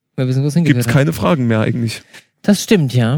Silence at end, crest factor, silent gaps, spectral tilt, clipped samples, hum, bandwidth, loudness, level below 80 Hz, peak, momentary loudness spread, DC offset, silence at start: 0 s; 14 dB; none; -6.5 dB/octave; under 0.1%; none; 19.5 kHz; -15 LUFS; -46 dBFS; 0 dBFS; 8 LU; under 0.1%; 0.15 s